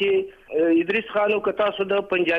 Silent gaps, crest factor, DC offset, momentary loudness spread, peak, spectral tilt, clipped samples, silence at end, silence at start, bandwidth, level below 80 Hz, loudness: none; 12 dB; under 0.1%; 4 LU; -10 dBFS; -7 dB/octave; under 0.1%; 0 s; 0 s; 5 kHz; -60 dBFS; -22 LUFS